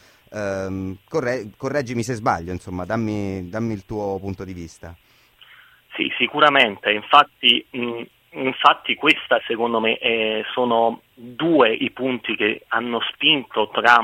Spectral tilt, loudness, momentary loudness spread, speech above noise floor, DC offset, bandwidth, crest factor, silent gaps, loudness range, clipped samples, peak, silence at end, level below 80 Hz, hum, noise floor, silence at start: -4.5 dB/octave; -20 LUFS; 15 LU; 30 dB; under 0.1%; 16.5 kHz; 22 dB; none; 10 LU; under 0.1%; 0 dBFS; 0 s; -56 dBFS; none; -51 dBFS; 0.3 s